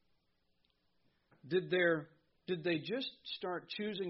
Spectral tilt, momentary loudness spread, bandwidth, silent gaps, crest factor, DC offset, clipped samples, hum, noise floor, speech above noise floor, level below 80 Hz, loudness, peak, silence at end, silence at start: -3.5 dB/octave; 10 LU; 5.8 kHz; none; 20 dB; under 0.1%; under 0.1%; none; -79 dBFS; 42 dB; -82 dBFS; -37 LUFS; -18 dBFS; 0 s; 1.45 s